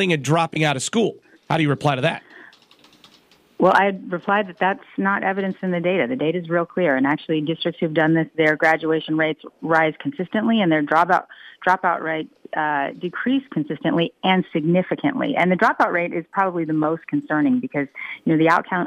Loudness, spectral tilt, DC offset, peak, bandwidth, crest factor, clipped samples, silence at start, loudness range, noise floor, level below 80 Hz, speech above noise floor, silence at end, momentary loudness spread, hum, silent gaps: -20 LUFS; -6 dB/octave; under 0.1%; -4 dBFS; 12.5 kHz; 16 dB; under 0.1%; 0 s; 2 LU; -55 dBFS; -68 dBFS; 35 dB; 0 s; 8 LU; none; none